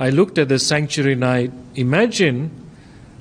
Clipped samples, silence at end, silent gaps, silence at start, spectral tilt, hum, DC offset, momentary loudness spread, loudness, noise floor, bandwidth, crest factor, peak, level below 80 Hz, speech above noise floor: under 0.1%; 0.2 s; none; 0 s; -5 dB/octave; none; under 0.1%; 9 LU; -18 LUFS; -42 dBFS; 13 kHz; 14 dB; -4 dBFS; -54 dBFS; 24 dB